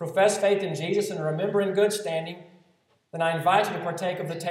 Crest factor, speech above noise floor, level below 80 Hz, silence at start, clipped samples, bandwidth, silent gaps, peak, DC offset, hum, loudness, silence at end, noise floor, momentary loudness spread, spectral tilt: 16 dB; 41 dB; -80 dBFS; 0 s; under 0.1%; 16 kHz; none; -8 dBFS; under 0.1%; none; -25 LUFS; 0 s; -66 dBFS; 9 LU; -4.5 dB/octave